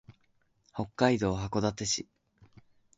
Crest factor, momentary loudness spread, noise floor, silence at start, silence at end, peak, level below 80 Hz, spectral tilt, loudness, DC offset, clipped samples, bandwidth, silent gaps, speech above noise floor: 22 dB; 14 LU; -71 dBFS; 0.1 s; 0.95 s; -12 dBFS; -54 dBFS; -4.5 dB/octave; -30 LUFS; under 0.1%; under 0.1%; 8 kHz; none; 41 dB